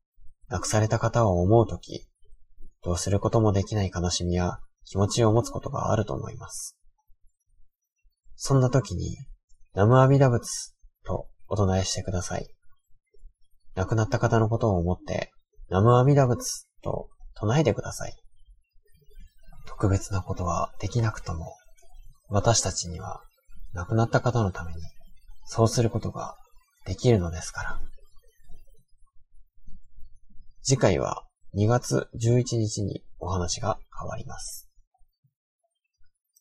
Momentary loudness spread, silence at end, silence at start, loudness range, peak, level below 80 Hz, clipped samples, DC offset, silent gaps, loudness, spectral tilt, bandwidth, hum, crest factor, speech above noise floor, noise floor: 16 LU; 0.35 s; 0.2 s; 7 LU; -6 dBFS; -44 dBFS; under 0.1%; under 0.1%; 9.44-9.48 s, 34.87-34.91 s, 35.18-35.23 s, 35.36-35.59 s; -26 LUFS; -6 dB/octave; 13 kHz; none; 22 dB; 32 dB; -57 dBFS